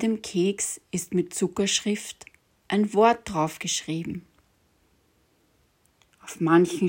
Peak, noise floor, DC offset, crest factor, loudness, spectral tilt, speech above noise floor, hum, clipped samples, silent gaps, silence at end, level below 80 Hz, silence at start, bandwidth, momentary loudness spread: -6 dBFS; -66 dBFS; under 0.1%; 20 dB; -25 LUFS; -4 dB/octave; 41 dB; none; under 0.1%; none; 0 s; -60 dBFS; 0 s; 16.5 kHz; 17 LU